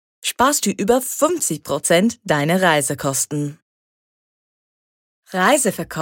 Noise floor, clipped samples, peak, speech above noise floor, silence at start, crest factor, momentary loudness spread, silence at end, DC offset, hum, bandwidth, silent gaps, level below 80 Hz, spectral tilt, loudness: under -90 dBFS; under 0.1%; -2 dBFS; over 72 dB; 0.25 s; 18 dB; 7 LU; 0 s; under 0.1%; none; 17 kHz; 3.62-5.23 s; -56 dBFS; -3.5 dB/octave; -18 LUFS